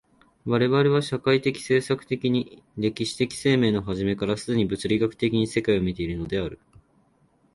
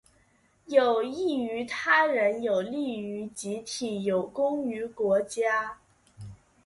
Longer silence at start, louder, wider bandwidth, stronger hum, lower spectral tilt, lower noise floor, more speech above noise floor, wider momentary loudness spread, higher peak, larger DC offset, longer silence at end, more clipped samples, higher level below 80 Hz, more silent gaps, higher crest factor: second, 0.45 s vs 0.7 s; first, -24 LUFS vs -27 LUFS; about the same, 11.5 kHz vs 11.5 kHz; neither; first, -6 dB/octave vs -4.5 dB/octave; about the same, -63 dBFS vs -65 dBFS; about the same, 39 dB vs 38 dB; second, 8 LU vs 13 LU; about the same, -8 dBFS vs -8 dBFS; neither; first, 1 s vs 0.3 s; neither; first, -50 dBFS vs -66 dBFS; neither; about the same, 18 dB vs 20 dB